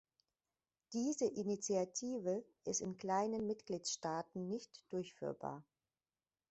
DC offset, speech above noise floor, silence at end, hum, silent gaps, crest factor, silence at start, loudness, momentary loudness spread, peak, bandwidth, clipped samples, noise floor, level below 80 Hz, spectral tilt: under 0.1%; over 49 dB; 0.9 s; none; none; 18 dB; 0.9 s; -42 LUFS; 8 LU; -24 dBFS; 8.2 kHz; under 0.1%; under -90 dBFS; -80 dBFS; -4.5 dB/octave